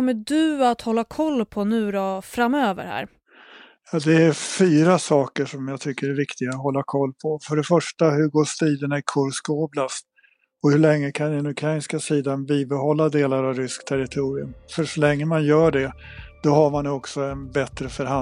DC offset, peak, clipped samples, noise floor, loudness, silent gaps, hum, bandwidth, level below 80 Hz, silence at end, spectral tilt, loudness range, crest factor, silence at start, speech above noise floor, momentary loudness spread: under 0.1%; -4 dBFS; under 0.1%; -61 dBFS; -22 LUFS; none; none; 14 kHz; -52 dBFS; 0 s; -6 dB/octave; 2 LU; 18 dB; 0 s; 40 dB; 11 LU